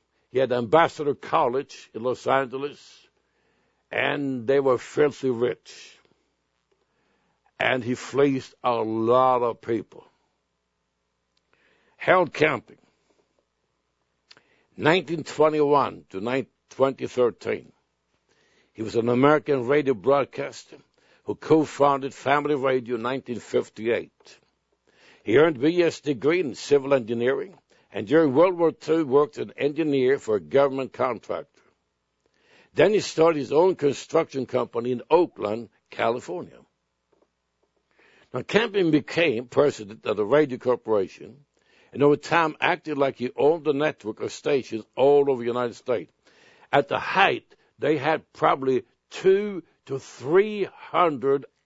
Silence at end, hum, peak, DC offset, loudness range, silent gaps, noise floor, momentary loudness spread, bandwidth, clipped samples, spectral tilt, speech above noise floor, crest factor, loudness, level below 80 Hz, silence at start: 0.2 s; none; -2 dBFS; under 0.1%; 5 LU; none; -76 dBFS; 13 LU; 8 kHz; under 0.1%; -6 dB/octave; 53 dB; 22 dB; -24 LUFS; -68 dBFS; 0.35 s